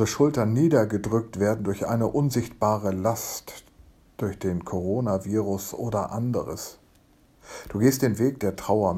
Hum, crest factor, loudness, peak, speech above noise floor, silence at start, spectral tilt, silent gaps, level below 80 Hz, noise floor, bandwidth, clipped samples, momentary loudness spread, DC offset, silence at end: none; 18 dB; -25 LUFS; -8 dBFS; 34 dB; 0 s; -6.5 dB/octave; none; -52 dBFS; -58 dBFS; 16.5 kHz; under 0.1%; 13 LU; under 0.1%; 0 s